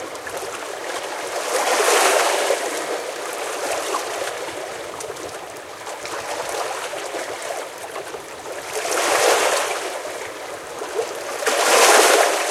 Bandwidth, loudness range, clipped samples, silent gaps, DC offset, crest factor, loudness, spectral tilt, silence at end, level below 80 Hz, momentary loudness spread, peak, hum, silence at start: 16.5 kHz; 10 LU; under 0.1%; none; under 0.1%; 22 dB; -21 LUFS; 0 dB/octave; 0 s; -66 dBFS; 16 LU; 0 dBFS; none; 0 s